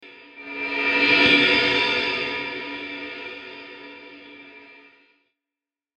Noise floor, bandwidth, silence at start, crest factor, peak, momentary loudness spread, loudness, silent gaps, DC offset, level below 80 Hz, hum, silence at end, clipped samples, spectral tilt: -90 dBFS; 9.4 kHz; 0 s; 20 dB; -4 dBFS; 25 LU; -19 LUFS; none; under 0.1%; -60 dBFS; none; 1.25 s; under 0.1%; -3.5 dB/octave